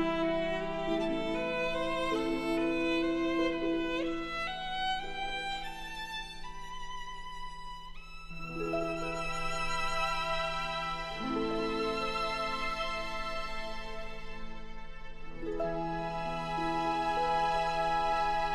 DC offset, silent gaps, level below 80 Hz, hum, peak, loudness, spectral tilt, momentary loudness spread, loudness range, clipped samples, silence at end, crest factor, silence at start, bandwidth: under 0.1%; none; -46 dBFS; none; -20 dBFS; -34 LUFS; -4.5 dB/octave; 14 LU; 7 LU; under 0.1%; 0 s; 14 dB; 0 s; 12.5 kHz